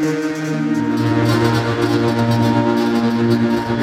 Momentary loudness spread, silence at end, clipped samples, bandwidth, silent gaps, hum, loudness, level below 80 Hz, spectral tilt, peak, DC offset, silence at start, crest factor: 4 LU; 0 s; under 0.1%; 15 kHz; none; none; -17 LUFS; -46 dBFS; -7 dB/octave; -2 dBFS; under 0.1%; 0 s; 14 dB